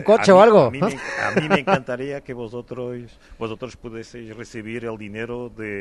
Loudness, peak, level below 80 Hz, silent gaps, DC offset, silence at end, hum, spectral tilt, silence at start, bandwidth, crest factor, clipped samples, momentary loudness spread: -18 LUFS; 0 dBFS; -52 dBFS; none; under 0.1%; 0 s; none; -6 dB/octave; 0 s; 11.5 kHz; 20 dB; under 0.1%; 23 LU